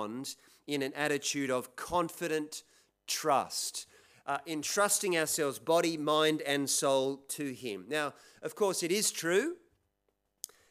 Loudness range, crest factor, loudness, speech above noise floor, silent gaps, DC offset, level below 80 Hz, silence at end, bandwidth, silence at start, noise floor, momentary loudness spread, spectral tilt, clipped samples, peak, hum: 5 LU; 20 dB; -32 LUFS; 47 dB; none; under 0.1%; -72 dBFS; 1.15 s; 16 kHz; 0 s; -80 dBFS; 16 LU; -2.5 dB/octave; under 0.1%; -14 dBFS; none